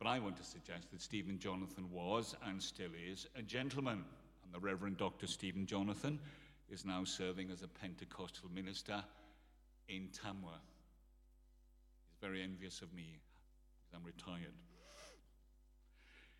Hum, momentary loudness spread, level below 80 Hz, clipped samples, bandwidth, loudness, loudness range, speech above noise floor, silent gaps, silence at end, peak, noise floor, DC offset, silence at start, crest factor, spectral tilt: none; 18 LU; -68 dBFS; under 0.1%; 16 kHz; -46 LUFS; 10 LU; 22 dB; none; 0 s; -24 dBFS; -68 dBFS; under 0.1%; 0 s; 24 dB; -4.5 dB/octave